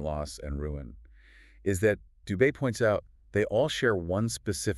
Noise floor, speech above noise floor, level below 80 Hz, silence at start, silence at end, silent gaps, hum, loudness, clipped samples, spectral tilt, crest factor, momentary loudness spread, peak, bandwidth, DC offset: -55 dBFS; 27 dB; -46 dBFS; 0 s; 0 s; none; none; -29 LUFS; under 0.1%; -5.5 dB/octave; 18 dB; 10 LU; -10 dBFS; 13.5 kHz; under 0.1%